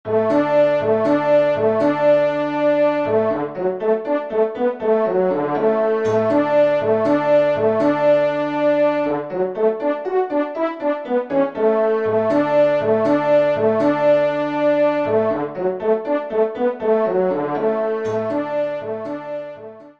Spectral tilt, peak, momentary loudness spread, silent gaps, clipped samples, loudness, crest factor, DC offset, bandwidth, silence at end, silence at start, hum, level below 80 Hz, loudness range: -7.5 dB/octave; -6 dBFS; 6 LU; none; under 0.1%; -18 LUFS; 12 dB; 0.2%; 6.6 kHz; 0.1 s; 0.05 s; none; -64 dBFS; 3 LU